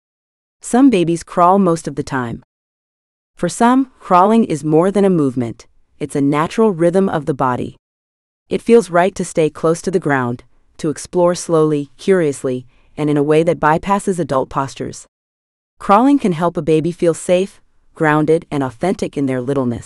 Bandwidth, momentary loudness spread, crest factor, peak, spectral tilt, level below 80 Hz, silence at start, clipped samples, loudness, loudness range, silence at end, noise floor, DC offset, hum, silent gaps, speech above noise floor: 12 kHz; 12 LU; 16 dB; 0 dBFS; -6.5 dB/octave; -48 dBFS; 0.65 s; under 0.1%; -16 LUFS; 2 LU; 0.05 s; under -90 dBFS; under 0.1%; none; 2.44-3.34 s, 7.79-8.46 s, 15.08-15.77 s; over 75 dB